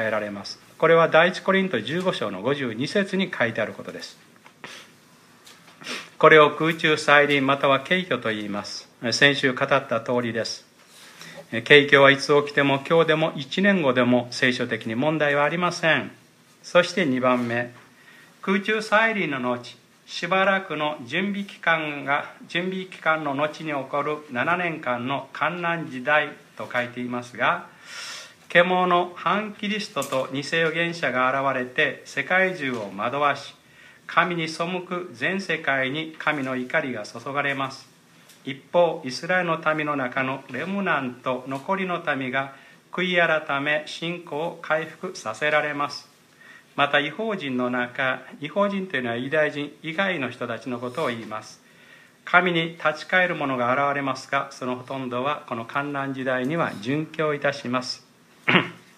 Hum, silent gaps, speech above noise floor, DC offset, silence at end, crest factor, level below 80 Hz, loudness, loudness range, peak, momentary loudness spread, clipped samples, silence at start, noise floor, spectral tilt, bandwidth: none; none; 30 dB; under 0.1%; 0.2 s; 24 dB; -74 dBFS; -23 LUFS; 7 LU; 0 dBFS; 13 LU; under 0.1%; 0 s; -53 dBFS; -5 dB/octave; 15 kHz